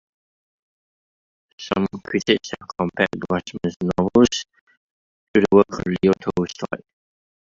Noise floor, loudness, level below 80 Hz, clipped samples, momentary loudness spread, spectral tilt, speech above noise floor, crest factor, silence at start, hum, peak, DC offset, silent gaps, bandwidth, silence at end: under -90 dBFS; -21 LUFS; -50 dBFS; under 0.1%; 14 LU; -5.5 dB/octave; over 70 dB; 20 dB; 1.6 s; none; -2 dBFS; under 0.1%; 3.76-3.80 s, 4.61-4.67 s, 4.77-5.34 s; 7.6 kHz; 0.8 s